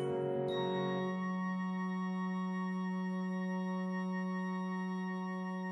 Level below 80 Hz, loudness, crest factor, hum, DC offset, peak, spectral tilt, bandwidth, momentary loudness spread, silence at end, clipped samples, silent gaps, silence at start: -80 dBFS; -37 LUFS; 12 dB; none; under 0.1%; -26 dBFS; -8 dB/octave; 6 kHz; 3 LU; 0 s; under 0.1%; none; 0 s